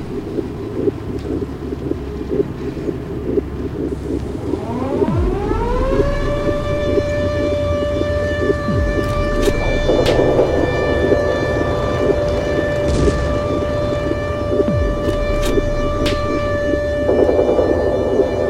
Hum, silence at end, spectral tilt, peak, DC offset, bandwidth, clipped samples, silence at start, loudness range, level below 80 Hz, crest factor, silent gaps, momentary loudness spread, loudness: none; 0 s; -7 dB/octave; 0 dBFS; under 0.1%; 16 kHz; under 0.1%; 0 s; 6 LU; -26 dBFS; 16 dB; none; 9 LU; -18 LUFS